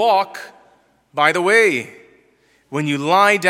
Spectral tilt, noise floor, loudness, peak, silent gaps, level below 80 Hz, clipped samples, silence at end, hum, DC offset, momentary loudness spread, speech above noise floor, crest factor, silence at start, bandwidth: -4 dB/octave; -57 dBFS; -16 LUFS; 0 dBFS; none; -74 dBFS; under 0.1%; 0 s; none; under 0.1%; 16 LU; 41 dB; 18 dB; 0 s; 16 kHz